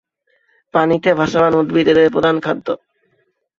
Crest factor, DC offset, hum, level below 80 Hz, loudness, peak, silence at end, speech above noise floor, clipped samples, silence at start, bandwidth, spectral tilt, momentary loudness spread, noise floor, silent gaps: 14 dB; under 0.1%; none; -52 dBFS; -15 LUFS; -2 dBFS; 0.85 s; 50 dB; under 0.1%; 0.75 s; 7.4 kHz; -6.5 dB/octave; 10 LU; -64 dBFS; none